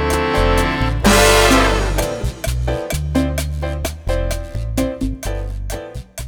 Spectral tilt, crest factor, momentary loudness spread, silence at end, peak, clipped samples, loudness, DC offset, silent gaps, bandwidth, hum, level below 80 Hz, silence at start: -4.5 dB/octave; 16 dB; 14 LU; 0 s; 0 dBFS; under 0.1%; -17 LUFS; under 0.1%; none; over 20 kHz; none; -22 dBFS; 0 s